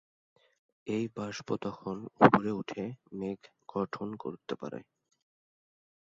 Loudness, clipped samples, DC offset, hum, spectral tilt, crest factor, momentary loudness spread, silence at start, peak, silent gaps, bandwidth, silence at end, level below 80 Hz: -32 LUFS; under 0.1%; under 0.1%; none; -5.5 dB/octave; 30 dB; 17 LU; 0.85 s; -4 dBFS; none; 7.6 kHz; 1.35 s; -68 dBFS